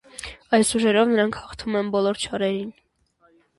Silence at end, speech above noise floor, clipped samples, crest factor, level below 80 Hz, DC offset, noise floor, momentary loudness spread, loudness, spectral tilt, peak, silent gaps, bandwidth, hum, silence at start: 0.85 s; 41 dB; under 0.1%; 18 dB; -54 dBFS; under 0.1%; -62 dBFS; 15 LU; -22 LUFS; -4 dB/octave; -4 dBFS; none; 11.5 kHz; none; 0.2 s